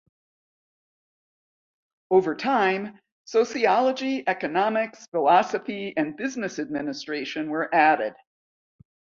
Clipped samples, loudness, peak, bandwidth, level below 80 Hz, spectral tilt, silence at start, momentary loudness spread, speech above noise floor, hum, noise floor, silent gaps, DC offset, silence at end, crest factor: under 0.1%; -24 LUFS; -6 dBFS; 7.6 kHz; -72 dBFS; -4.5 dB/octave; 2.1 s; 10 LU; over 66 dB; none; under -90 dBFS; 3.12-3.24 s, 5.08-5.12 s; under 0.1%; 1.05 s; 20 dB